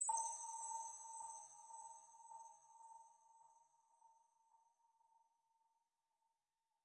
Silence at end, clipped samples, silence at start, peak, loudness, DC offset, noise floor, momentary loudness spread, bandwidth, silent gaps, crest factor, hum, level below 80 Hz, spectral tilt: 1.65 s; under 0.1%; 0 s; -30 dBFS; -50 LUFS; under 0.1%; under -90 dBFS; 19 LU; 11.5 kHz; none; 24 dB; none; under -90 dBFS; 1.5 dB/octave